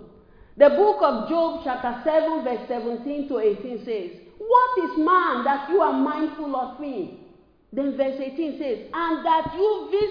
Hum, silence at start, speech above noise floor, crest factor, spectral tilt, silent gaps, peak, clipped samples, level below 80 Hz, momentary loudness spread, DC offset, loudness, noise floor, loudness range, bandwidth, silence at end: none; 0 s; 29 dB; 22 dB; -7.5 dB/octave; none; -2 dBFS; under 0.1%; -56 dBFS; 12 LU; under 0.1%; -23 LUFS; -51 dBFS; 5 LU; 5.2 kHz; 0 s